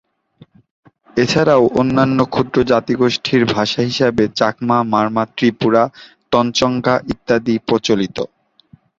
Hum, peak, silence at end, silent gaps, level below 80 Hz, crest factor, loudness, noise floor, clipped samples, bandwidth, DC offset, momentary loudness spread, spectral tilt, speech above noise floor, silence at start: none; -2 dBFS; 0.75 s; none; -48 dBFS; 16 dB; -16 LUFS; -50 dBFS; under 0.1%; 7.8 kHz; under 0.1%; 5 LU; -5.5 dB/octave; 35 dB; 1.15 s